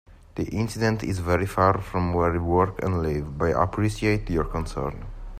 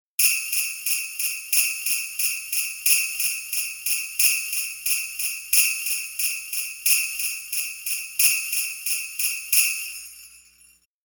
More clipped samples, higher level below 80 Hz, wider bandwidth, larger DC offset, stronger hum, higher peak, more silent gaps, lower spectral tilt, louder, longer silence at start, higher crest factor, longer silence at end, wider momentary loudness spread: neither; first, -38 dBFS vs -70 dBFS; second, 15 kHz vs over 20 kHz; neither; neither; about the same, -6 dBFS vs -4 dBFS; neither; first, -7 dB/octave vs 5.5 dB/octave; second, -25 LUFS vs -21 LUFS; about the same, 0.1 s vs 0.2 s; about the same, 18 dB vs 22 dB; second, 0 s vs 0.7 s; about the same, 9 LU vs 8 LU